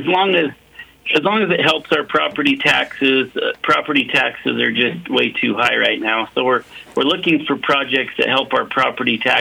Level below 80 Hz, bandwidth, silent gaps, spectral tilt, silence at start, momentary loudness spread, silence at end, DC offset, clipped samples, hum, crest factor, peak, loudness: -58 dBFS; 16.5 kHz; none; -4.5 dB/octave; 0 s; 4 LU; 0 s; under 0.1%; under 0.1%; none; 16 dB; -2 dBFS; -16 LUFS